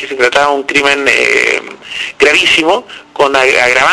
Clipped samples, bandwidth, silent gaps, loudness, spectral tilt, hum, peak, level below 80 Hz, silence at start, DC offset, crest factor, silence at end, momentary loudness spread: 0.7%; 11 kHz; none; -9 LUFS; -1.5 dB/octave; none; 0 dBFS; -46 dBFS; 0 s; under 0.1%; 10 dB; 0 s; 11 LU